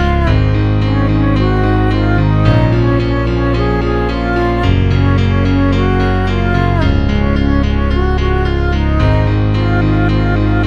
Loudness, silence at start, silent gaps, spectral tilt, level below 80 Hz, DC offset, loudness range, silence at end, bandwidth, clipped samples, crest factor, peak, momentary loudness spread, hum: -13 LUFS; 0 s; none; -8.5 dB/octave; -18 dBFS; 2%; 1 LU; 0 s; 7 kHz; under 0.1%; 12 dB; 0 dBFS; 2 LU; none